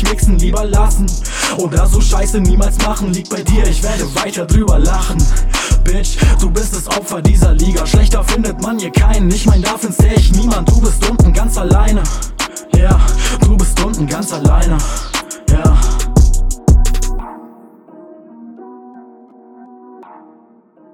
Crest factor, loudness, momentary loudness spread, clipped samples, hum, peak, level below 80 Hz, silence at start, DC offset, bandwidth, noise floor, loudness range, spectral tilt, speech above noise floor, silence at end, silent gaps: 12 dB; -14 LUFS; 7 LU; under 0.1%; none; 0 dBFS; -12 dBFS; 0 s; under 0.1%; 15.5 kHz; -46 dBFS; 3 LU; -5 dB/octave; 36 dB; 0.9 s; none